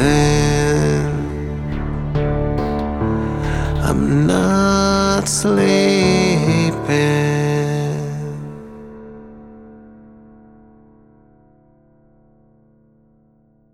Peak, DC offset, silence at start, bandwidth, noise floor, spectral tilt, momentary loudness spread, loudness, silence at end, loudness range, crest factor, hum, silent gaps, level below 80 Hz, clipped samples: -2 dBFS; under 0.1%; 0 s; 13.5 kHz; -55 dBFS; -5.5 dB/octave; 14 LU; -17 LUFS; 3.8 s; 12 LU; 16 dB; none; none; -30 dBFS; under 0.1%